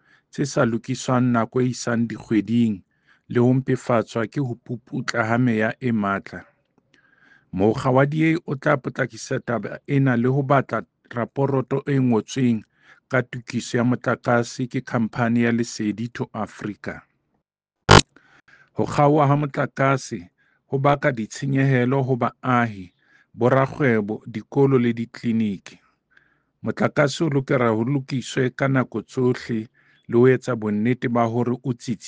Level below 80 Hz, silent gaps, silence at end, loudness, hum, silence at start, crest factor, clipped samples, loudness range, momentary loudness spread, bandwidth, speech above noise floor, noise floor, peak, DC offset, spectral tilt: -48 dBFS; none; 0 s; -22 LUFS; none; 0.35 s; 20 dB; under 0.1%; 3 LU; 11 LU; 9.6 kHz; 58 dB; -79 dBFS; -2 dBFS; under 0.1%; -6 dB/octave